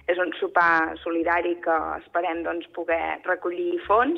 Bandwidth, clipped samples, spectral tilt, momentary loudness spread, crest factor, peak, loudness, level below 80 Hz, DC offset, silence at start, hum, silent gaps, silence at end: 6.2 kHz; under 0.1%; -6 dB/octave; 8 LU; 16 dB; -8 dBFS; -24 LUFS; -56 dBFS; under 0.1%; 0.1 s; none; none; 0 s